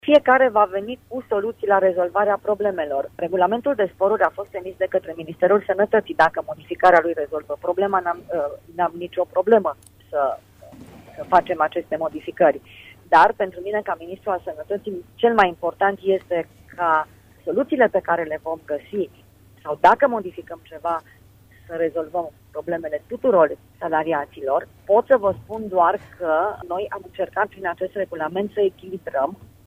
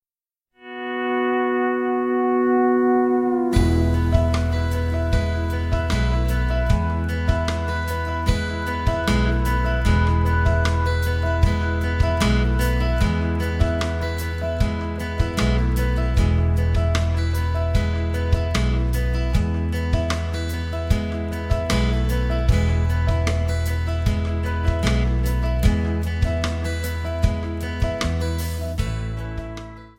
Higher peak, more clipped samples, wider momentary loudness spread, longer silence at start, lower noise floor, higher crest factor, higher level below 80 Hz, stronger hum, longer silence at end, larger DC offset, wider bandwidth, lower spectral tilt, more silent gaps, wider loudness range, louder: about the same, -2 dBFS vs -4 dBFS; neither; first, 13 LU vs 7 LU; second, 0.05 s vs 0.65 s; second, -50 dBFS vs under -90 dBFS; about the same, 18 dB vs 18 dB; second, -56 dBFS vs -24 dBFS; neither; about the same, 0.2 s vs 0.1 s; neither; about the same, 16 kHz vs 16.5 kHz; about the same, -6.5 dB/octave vs -6.5 dB/octave; neither; about the same, 4 LU vs 3 LU; about the same, -21 LUFS vs -22 LUFS